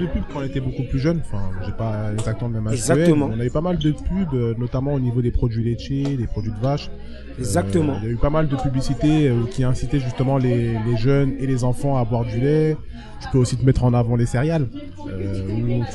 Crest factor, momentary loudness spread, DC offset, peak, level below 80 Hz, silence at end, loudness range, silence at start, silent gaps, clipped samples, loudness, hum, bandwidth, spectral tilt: 18 dB; 9 LU; under 0.1%; -2 dBFS; -34 dBFS; 0 s; 3 LU; 0 s; none; under 0.1%; -21 LUFS; none; 12 kHz; -7.5 dB/octave